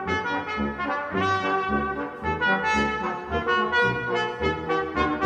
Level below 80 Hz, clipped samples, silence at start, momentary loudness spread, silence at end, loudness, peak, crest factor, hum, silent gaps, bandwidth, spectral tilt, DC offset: -44 dBFS; under 0.1%; 0 s; 6 LU; 0 s; -25 LUFS; -10 dBFS; 16 dB; none; none; 9.6 kHz; -5.5 dB/octave; under 0.1%